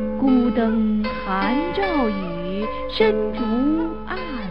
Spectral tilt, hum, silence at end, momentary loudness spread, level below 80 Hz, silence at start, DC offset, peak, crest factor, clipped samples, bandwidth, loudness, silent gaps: -8.5 dB/octave; none; 0 s; 9 LU; -40 dBFS; 0 s; 2%; -6 dBFS; 16 dB; under 0.1%; 5.6 kHz; -21 LUFS; none